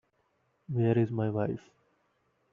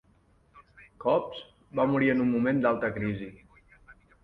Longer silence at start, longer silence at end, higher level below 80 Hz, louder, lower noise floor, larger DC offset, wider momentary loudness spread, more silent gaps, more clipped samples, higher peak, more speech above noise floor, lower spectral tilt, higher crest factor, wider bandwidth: first, 0.7 s vs 0.55 s; first, 0.95 s vs 0.3 s; second, -70 dBFS vs -60 dBFS; second, -30 LUFS vs -27 LUFS; first, -74 dBFS vs -64 dBFS; neither; second, 9 LU vs 15 LU; neither; neither; about the same, -14 dBFS vs -12 dBFS; first, 45 dB vs 37 dB; about the same, -9.5 dB/octave vs -9 dB/octave; about the same, 18 dB vs 18 dB; second, 3.8 kHz vs 5.2 kHz